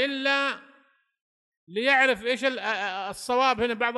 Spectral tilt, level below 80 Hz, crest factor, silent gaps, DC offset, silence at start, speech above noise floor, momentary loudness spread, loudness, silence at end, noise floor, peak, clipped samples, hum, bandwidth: -2.5 dB/octave; -64 dBFS; 18 dB; 1.21-1.67 s; under 0.1%; 0 s; 37 dB; 11 LU; -24 LUFS; 0 s; -63 dBFS; -8 dBFS; under 0.1%; none; 12 kHz